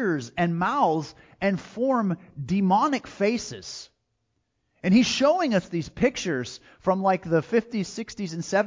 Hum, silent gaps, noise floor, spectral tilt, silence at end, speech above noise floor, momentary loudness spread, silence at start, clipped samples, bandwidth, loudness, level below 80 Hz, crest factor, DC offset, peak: none; none; -75 dBFS; -5.5 dB/octave; 0 s; 51 dB; 12 LU; 0 s; under 0.1%; 7.6 kHz; -25 LUFS; -56 dBFS; 16 dB; under 0.1%; -8 dBFS